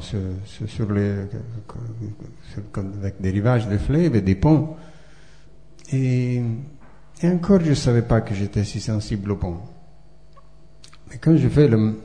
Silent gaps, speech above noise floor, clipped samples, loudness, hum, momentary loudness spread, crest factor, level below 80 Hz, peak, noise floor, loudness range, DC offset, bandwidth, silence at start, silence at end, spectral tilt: none; 30 dB; under 0.1%; -21 LUFS; none; 17 LU; 18 dB; -40 dBFS; -4 dBFS; -50 dBFS; 5 LU; 0.7%; 10 kHz; 0 s; 0 s; -8 dB/octave